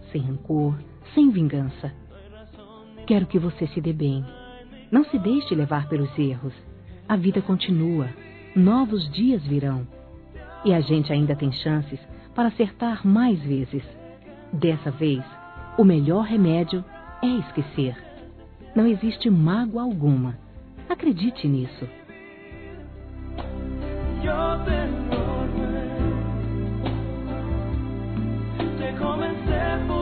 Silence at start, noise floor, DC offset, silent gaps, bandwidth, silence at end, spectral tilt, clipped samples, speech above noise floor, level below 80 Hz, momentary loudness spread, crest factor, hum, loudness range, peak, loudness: 0 s; -44 dBFS; under 0.1%; none; 4.6 kHz; 0 s; -7 dB/octave; under 0.1%; 23 dB; -38 dBFS; 21 LU; 18 dB; none; 5 LU; -6 dBFS; -24 LUFS